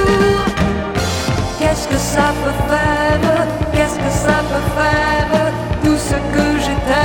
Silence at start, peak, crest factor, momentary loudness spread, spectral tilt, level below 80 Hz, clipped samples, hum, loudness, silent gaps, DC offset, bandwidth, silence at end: 0 s; 0 dBFS; 14 dB; 4 LU; -5 dB/octave; -26 dBFS; under 0.1%; none; -16 LUFS; none; under 0.1%; 17.5 kHz; 0 s